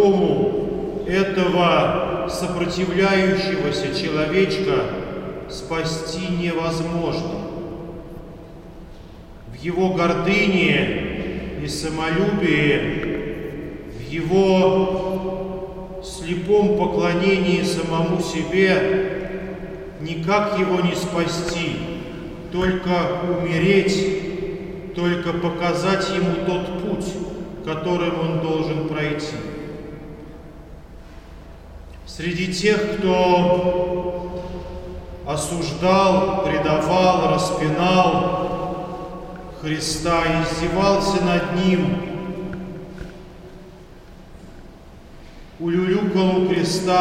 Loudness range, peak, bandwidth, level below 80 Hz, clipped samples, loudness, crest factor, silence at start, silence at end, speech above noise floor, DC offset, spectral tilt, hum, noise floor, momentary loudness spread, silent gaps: 7 LU; -4 dBFS; 14.5 kHz; -40 dBFS; under 0.1%; -21 LUFS; 18 dB; 0 s; 0 s; 22 dB; under 0.1%; -5.5 dB/octave; none; -42 dBFS; 17 LU; none